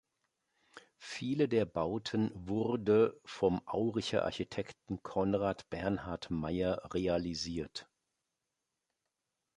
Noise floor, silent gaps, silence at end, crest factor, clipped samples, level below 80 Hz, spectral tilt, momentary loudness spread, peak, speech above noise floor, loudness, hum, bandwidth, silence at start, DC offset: -87 dBFS; none; 1.75 s; 20 dB; under 0.1%; -58 dBFS; -6 dB/octave; 11 LU; -16 dBFS; 53 dB; -35 LUFS; none; 11 kHz; 0.75 s; under 0.1%